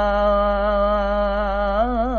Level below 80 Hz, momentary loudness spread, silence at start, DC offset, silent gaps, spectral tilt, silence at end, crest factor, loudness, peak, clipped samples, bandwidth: -28 dBFS; 3 LU; 0 s; 0.6%; none; -8 dB/octave; 0 s; 10 dB; -20 LUFS; -8 dBFS; under 0.1%; 6.6 kHz